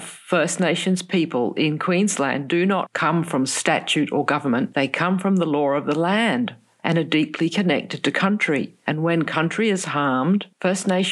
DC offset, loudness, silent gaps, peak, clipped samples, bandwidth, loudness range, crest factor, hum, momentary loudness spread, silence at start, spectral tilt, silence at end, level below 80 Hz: under 0.1%; -21 LUFS; none; -4 dBFS; under 0.1%; 12.5 kHz; 1 LU; 18 dB; none; 3 LU; 0 s; -5 dB/octave; 0 s; -74 dBFS